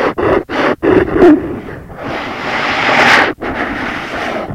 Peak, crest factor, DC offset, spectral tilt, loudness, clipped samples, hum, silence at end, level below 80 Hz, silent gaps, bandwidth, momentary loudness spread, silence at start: 0 dBFS; 12 dB; under 0.1%; -5 dB/octave; -12 LUFS; 0.5%; none; 0 s; -36 dBFS; none; 14.5 kHz; 15 LU; 0 s